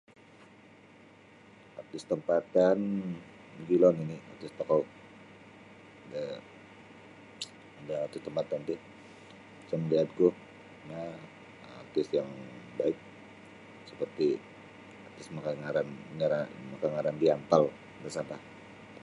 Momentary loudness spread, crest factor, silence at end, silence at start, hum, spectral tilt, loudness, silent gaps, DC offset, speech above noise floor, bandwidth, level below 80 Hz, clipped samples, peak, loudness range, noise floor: 25 LU; 24 dB; 0 s; 1.75 s; none; -7 dB/octave; -32 LUFS; none; under 0.1%; 26 dB; 11.5 kHz; -72 dBFS; under 0.1%; -8 dBFS; 9 LU; -56 dBFS